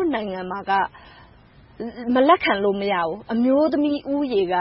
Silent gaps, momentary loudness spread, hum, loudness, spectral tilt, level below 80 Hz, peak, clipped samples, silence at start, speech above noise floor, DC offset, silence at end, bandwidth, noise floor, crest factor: none; 12 LU; none; -21 LUFS; -10 dB/octave; -54 dBFS; -4 dBFS; under 0.1%; 0 s; 29 dB; under 0.1%; 0 s; 5.8 kHz; -50 dBFS; 18 dB